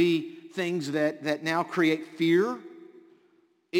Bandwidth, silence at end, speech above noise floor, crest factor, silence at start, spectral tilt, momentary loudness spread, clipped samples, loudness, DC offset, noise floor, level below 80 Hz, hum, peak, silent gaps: 16 kHz; 0 s; 39 dB; 16 dB; 0 s; -5.5 dB/octave; 10 LU; under 0.1%; -27 LUFS; under 0.1%; -65 dBFS; -76 dBFS; none; -12 dBFS; none